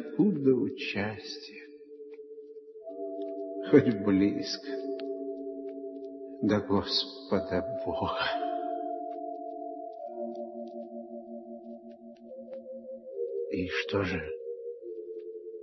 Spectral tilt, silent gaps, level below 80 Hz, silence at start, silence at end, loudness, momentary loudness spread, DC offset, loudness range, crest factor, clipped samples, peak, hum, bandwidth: -6 dB/octave; none; -64 dBFS; 0 s; 0 s; -32 LUFS; 20 LU; under 0.1%; 11 LU; 24 dB; under 0.1%; -8 dBFS; none; 6.2 kHz